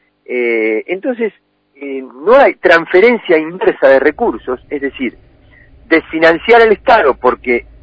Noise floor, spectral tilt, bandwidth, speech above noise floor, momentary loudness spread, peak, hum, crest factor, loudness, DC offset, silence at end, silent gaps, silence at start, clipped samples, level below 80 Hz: -43 dBFS; -6 dB/octave; 8 kHz; 32 dB; 14 LU; 0 dBFS; none; 12 dB; -12 LUFS; under 0.1%; 0.2 s; none; 0.3 s; 0.5%; -44 dBFS